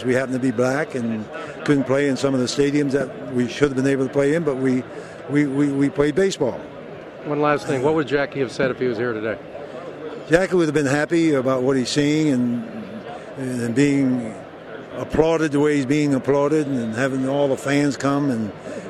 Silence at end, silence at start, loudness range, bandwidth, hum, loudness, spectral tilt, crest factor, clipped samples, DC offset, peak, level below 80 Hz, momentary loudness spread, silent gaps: 0 s; 0 s; 3 LU; 12 kHz; none; -20 LUFS; -6 dB/octave; 20 dB; under 0.1%; under 0.1%; -2 dBFS; -50 dBFS; 15 LU; none